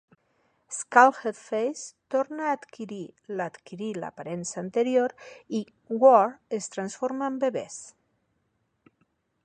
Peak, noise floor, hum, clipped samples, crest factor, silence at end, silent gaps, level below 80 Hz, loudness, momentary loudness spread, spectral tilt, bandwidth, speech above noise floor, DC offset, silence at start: -4 dBFS; -74 dBFS; none; under 0.1%; 24 dB; 1.55 s; none; -78 dBFS; -26 LUFS; 19 LU; -4.5 dB/octave; 9.8 kHz; 48 dB; under 0.1%; 0.7 s